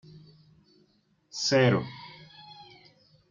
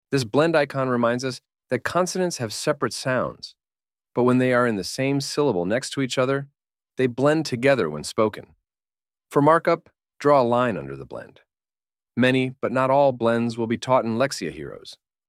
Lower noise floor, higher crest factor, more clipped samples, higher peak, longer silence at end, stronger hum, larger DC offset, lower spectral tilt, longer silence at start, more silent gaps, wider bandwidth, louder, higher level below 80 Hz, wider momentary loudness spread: second, -68 dBFS vs under -90 dBFS; about the same, 22 dB vs 20 dB; neither; second, -10 dBFS vs -4 dBFS; first, 0.7 s vs 0.35 s; neither; neither; about the same, -5 dB/octave vs -5.5 dB/octave; about the same, 0.15 s vs 0.1 s; neither; second, 7.6 kHz vs 15.5 kHz; second, -25 LUFS vs -22 LUFS; second, -70 dBFS vs -62 dBFS; first, 25 LU vs 15 LU